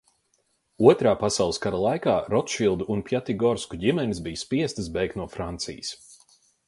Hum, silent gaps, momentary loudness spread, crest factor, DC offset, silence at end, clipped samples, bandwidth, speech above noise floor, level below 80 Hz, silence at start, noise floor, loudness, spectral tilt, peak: none; none; 12 LU; 24 dB; under 0.1%; 0.55 s; under 0.1%; 11.5 kHz; 46 dB; -50 dBFS; 0.8 s; -70 dBFS; -25 LUFS; -5 dB/octave; -2 dBFS